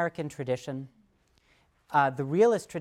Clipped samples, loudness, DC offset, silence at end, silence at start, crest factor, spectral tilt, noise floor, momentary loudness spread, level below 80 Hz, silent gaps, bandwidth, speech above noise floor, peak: under 0.1%; -28 LUFS; under 0.1%; 0 s; 0 s; 18 dB; -6.5 dB/octave; -67 dBFS; 15 LU; -70 dBFS; none; 13.5 kHz; 39 dB; -10 dBFS